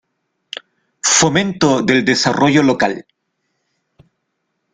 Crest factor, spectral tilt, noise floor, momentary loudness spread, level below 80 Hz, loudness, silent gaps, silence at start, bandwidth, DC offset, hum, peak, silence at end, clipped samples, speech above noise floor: 18 dB; -3.5 dB/octave; -72 dBFS; 20 LU; -52 dBFS; -14 LUFS; none; 1.05 s; 9.6 kHz; under 0.1%; none; 0 dBFS; 1.7 s; under 0.1%; 58 dB